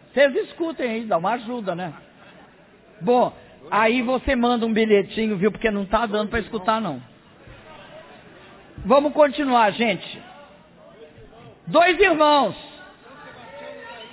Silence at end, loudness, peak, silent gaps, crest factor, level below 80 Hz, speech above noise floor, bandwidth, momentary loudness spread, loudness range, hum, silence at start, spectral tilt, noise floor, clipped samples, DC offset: 0 s; -20 LUFS; -4 dBFS; none; 18 dB; -48 dBFS; 31 dB; 4 kHz; 21 LU; 4 LU; none; 0.15 s; -9 dB/octave; -51 dBFS; under 0.1%; under 0.1%